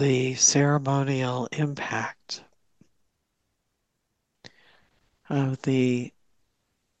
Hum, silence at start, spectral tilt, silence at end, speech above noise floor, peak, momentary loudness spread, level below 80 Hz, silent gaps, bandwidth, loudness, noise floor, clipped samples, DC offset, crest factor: none; 0 s; -4 dB/octave; 0.9 s; 53 dB; -6 dBFS; 16 LU; -70 dBFS; none; 9 kHz; -24 LUFS; -78 dBFS; under 0.1%; under 0.1%; 22 dB